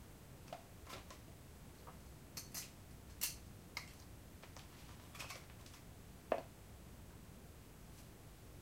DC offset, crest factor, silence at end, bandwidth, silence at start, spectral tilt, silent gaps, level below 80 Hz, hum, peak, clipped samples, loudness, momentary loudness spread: under 0.1%; 34 dB; 0 s; 16 kHz; 0 s; -3 dB/octave; none; -62 dBFS; none; -20 dBFS; under 0.1%; -52 LUFS; 14 LU